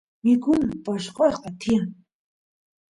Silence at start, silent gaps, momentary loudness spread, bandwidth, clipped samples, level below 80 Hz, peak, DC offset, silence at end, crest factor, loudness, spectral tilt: 0.25 s; none; 10 LU; 11 kHz; under 0.1%; -54 dBFS; -8 dBFS; under 0.1%; 1 s; 16 dB; -23 LUFS; -6.5 dB/octave